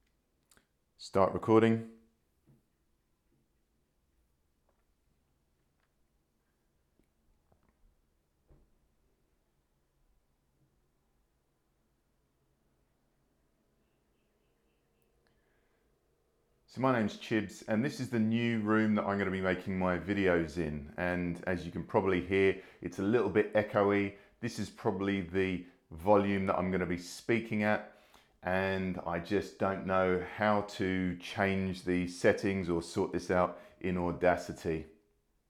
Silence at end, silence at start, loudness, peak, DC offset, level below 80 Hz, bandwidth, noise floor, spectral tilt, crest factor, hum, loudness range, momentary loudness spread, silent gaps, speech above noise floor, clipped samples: 0.6 s; 1 s; -32 LUFS; -12 dBFS; under 0.1%; -62 dBFS; 13.5 kHz; -77 dBFS; -6.5 dB/octave; 22 dB; none; 3 LU; 9 LU; none; 45 dB; under 0.1%